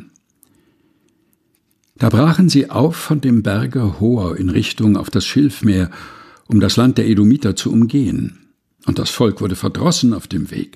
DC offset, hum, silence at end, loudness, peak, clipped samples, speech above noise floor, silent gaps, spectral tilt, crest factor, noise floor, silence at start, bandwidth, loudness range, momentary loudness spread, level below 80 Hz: under 0.1%; none; 0.1 s; -16 LUFS; 0 dBFS; under 0.1%; 48 dB; none; -6 dB/octave; 16 dB; -63 dBFS; 0 s; 14.5 kHz; 2 LU; 9 LU; -42 dBFS